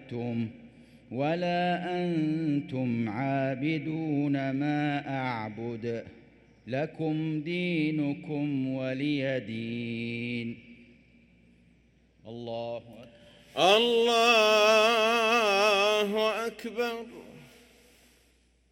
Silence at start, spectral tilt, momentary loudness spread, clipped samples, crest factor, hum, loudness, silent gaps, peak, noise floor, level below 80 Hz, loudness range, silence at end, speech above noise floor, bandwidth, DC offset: 0 s; -5 dB/octave; 15 LU; under 0.1%; 22 dB; none; -28 LUFS; none; -8 dBFS; -65 dBFS; -68 dBFS; 12 LU; 1.25 s; 37 dB; 16.5 kHz; under 0.1%